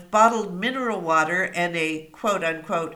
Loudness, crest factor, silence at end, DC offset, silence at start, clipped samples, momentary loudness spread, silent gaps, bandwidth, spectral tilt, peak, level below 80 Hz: -23 LUFS; 18 dB; 0 s; under 0.1%; 0 s; under 0.1%; 8 LU; none; 18.5 kHz; -4 dB/octave; -4 dBFS; -62 dBFS